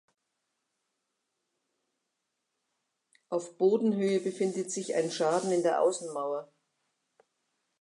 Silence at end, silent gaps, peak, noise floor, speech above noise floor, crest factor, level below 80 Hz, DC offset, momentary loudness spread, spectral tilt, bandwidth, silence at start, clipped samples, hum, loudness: 1.35 s; none; -14 dBFS; -83 dBFS; 54 dB; 18 dB; -88 dBFS; under 0.1%; 10 LU; -5 dB/octave; 11.5 kHz; 3.3 s; under 0.1%; none; -30 LUFS